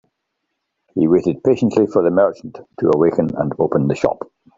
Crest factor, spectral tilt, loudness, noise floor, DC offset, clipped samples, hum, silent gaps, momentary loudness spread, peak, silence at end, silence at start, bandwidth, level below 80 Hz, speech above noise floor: 18 dB; -8.5 dB/octave; -17 LUFS; -75 dBFS; under 0.1%; under 0.1%; none; none; 9 LU; 0 dBFS; 0.35 s; 0.95 s; 7.6 kHz; -52 dBFS; 59 dB